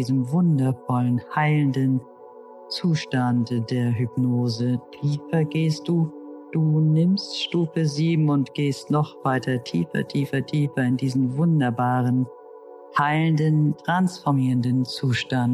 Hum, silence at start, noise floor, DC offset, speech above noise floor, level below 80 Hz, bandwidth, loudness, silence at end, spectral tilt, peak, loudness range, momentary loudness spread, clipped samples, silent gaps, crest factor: none; 0 s; -44 dBFS; under 0.1%; 22 dB; -66 dBFS; 12 kHz; -23 LUFS; 0 s; -7 dB/octave; -8 dBFS; 2 LU; 5 LU; under 0.1%; none; 14 dB